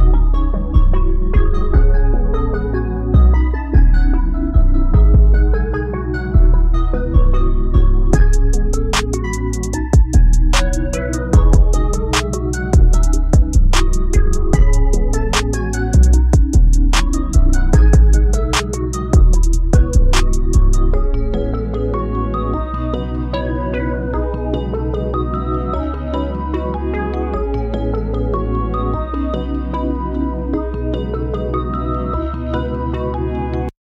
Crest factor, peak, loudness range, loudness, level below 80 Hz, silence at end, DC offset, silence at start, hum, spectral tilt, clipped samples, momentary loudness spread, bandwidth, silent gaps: 12 dB; 0 dBFS; 6 LU; -17 LUFS; -14 dBFS; 0.15 s; under 0.1%; 0 s; none; -6 dB/octave; under 0.1%; 8 LU; 11 kHz; none